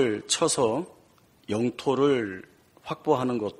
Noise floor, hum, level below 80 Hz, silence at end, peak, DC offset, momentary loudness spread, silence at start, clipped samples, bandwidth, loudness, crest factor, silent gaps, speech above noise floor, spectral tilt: -59 dBFS; none; -64 dBFS; 0.05 s; -10 dBFS; under 0.1%; 16 LU; 0 s; under 0.1%; 13 kHz; -26 LUFS; 18 dB; none; 33 dB; -4 dB/octave